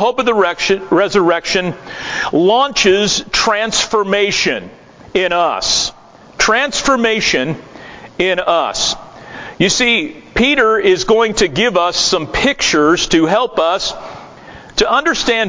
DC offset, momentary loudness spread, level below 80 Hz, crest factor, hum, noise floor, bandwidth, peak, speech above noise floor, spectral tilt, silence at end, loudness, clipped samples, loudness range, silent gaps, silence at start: under 0.1%; 11 LU; -40 dBFS; 14 dB; none; -36 dBFS; 7.6 kHz; 0 dBFS; 22 dB; -2.5 dB/octave; 0 s; -13 LUFS; under 0.1%; 3 LU; none; 0 s